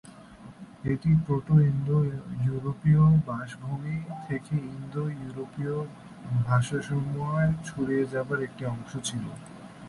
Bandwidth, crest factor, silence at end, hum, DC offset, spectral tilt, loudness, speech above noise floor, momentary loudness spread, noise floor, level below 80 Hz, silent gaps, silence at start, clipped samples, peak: 11.5 kHz; 18 dB; 0 s; none; under 0.1%; -7.5 dB/octave; -28 LUFS; 21 dB; 15 LU; -48 dBFS; -52 dBFS; none; 0.05 s; under 0.1%; -10 dBFS